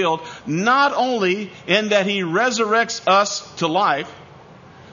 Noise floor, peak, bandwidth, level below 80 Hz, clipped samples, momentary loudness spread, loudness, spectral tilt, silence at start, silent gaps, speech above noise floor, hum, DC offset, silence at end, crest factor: -43 dBFS; -2 dBFS; 7.4 kHz; -64 dBFS; under 0.1%; 9 LU; -19 LUFS; -3.5 dB/octave; 0 s; none; 24 dB; none; under 0.1%; 0.05 s; 18 dB